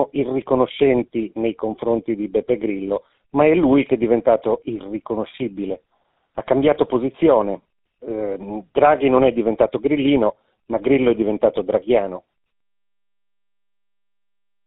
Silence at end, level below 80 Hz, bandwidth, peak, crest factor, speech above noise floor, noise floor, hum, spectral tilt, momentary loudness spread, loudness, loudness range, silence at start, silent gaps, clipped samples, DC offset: 2.5 s; -50 dBFS; 4 kHz; -2 dBFS; 18 dB; 71 dB; -89 dBFS; none; -5.5 dB/octave; 12 LU; -19 LUFS; 3 LU; 0 s; none; under 0.1%; under 0.1%